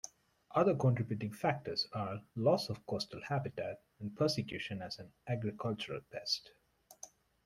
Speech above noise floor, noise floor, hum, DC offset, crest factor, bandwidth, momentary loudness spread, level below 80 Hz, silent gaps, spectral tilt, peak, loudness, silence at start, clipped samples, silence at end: 22 dB; -58 dBFS; none; under 0.1%; 20 dB; 15.5 kHz; 14 LU; -70 dBFS; none; -5.5 dB/octave; -18 dBFS; -37 LUFS; 0.05 s; under 0.1%; 0.4 s